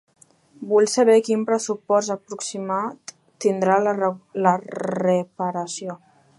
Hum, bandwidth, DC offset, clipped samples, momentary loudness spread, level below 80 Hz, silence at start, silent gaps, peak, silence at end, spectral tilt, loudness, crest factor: none; 11.5 kHz; under 0.1%; under 0.1%; 15 LU; -76 dBFS; 0.6 s; none; -2 dBFS; 0.4 s; -5 dB/octave; -22 LUFS; 20 dB